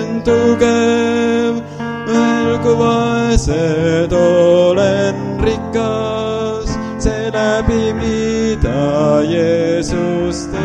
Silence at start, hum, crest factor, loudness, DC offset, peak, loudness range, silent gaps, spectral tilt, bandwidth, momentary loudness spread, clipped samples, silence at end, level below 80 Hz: 0 s; none; 14 dB; -15 LUFS; under 0.1%; 0 dBFS; 4 LU; none; -6 dB/octave; 10 kHz; 7 LU; under 0.1%; 0 s; -28 dBFS